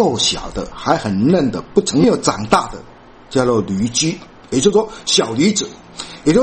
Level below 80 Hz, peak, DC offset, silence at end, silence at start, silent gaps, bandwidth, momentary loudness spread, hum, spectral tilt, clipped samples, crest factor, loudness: -40 dBFS; 0 dBFS; under 0.1%; 0 s; 0 s; none; 9 kHz; 13 LU; none; -4 dB/octave; under 0.1%; 16 dB; -16 LUFS